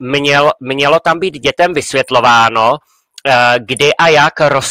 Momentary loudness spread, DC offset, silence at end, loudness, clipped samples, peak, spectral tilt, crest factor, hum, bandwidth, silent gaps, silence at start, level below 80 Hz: 6 LU; 0.2%; 0 s; -11 LUFS; under 0.1%; 0 dBFS; -3.5 dB/octave; 12 dB; none; 16 kHz; none; 0 s; -48 dBFS